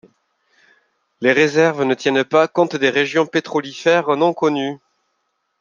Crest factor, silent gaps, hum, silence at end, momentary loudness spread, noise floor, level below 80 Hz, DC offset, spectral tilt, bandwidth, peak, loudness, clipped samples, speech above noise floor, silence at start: 18 dB; none; none; 0.85 s; 6 LU; -70 dBFS; -68 dBFS; under 0.1%; -5 dB/octave; 7.4 kHz; 0 dBFS; -17 LUFS; under 0.1%; 54 dB; 1.2 s